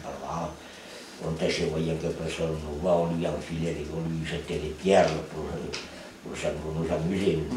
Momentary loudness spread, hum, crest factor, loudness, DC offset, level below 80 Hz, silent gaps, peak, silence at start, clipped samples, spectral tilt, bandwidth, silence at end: 13 LU; none; 20 dB; -29 LUFS; under 0.1%; -46 dBFS; none; -8 dBFS; 0 s; under 0.1%; -6 dB/octave; 13.5 kHz; 0 s